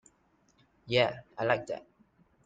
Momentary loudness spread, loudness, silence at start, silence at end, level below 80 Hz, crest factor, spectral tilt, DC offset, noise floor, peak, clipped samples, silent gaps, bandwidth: 13 LU; -31 LUFS; 0.85 s; 0.65 s; -68 dBFS; 22 dB; -5.5 dB/octave; under 0.1%; -69 dBFS; -12 dBFS; under 0.1%; none; 9 kHz